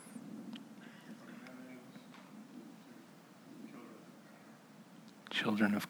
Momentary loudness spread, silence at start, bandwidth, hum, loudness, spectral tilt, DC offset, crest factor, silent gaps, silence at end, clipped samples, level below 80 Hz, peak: 21 LU; 0 s; over 20 kHz; none; -43 LUFS; -5 dB/octave; under 0.1%; 24 dB; none; 0 s; under 0.1%; under -90 dBFS; -18 dBFS